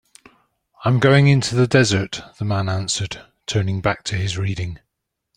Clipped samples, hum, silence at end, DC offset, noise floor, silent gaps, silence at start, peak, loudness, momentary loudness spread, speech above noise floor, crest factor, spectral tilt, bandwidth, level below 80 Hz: under 0.1%; none; 0.6 s; under 0.1%; -78 dBFS; none; 0.8 s; -2 dBFS; -19 LUFS; 14 LU; 59 dB; 18 dB; -5.5 dB/octave; 10.5 kHz; -48 dBFS